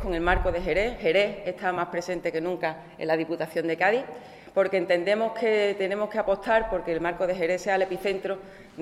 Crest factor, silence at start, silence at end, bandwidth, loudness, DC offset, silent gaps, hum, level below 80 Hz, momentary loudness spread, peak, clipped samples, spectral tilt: 18 dB; 0 s; 0 s; 14 kHz; -26 LUFS; under 0.1%; none; none; -42 dBFS; 7 LU; -8 dBFS; under 0.1%; -5.5 dB/octave